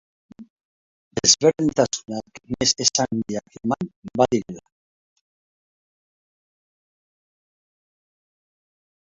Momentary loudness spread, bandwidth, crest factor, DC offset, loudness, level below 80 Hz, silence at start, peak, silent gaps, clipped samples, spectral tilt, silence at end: 17 LU; 8.4 kHz; 24 dB; under 0.1%; -21 LUFS; -58 dBFS; 0.4 s; -2 dBFS; 0.50-0.56 s, 0.65-1.11 s, 3.96-4.02 s; under 0.1%; -3 dB/octave; 4.5 s